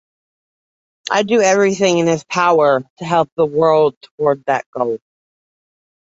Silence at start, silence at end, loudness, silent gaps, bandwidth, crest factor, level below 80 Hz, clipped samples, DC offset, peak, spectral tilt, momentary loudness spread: 1.1 s; 1.15 s; -16 LUFS; 2.90-2.97 s, 3.32-3.37 s, 3.97-4.01 s, 4.11-4.18 s, 4.66-4.73 s; 8 kHz; 16 dB; -62 dBFS; under 0.1%; under 0.1%; -2 dBFS; -4.5 dB/octave; 8 LU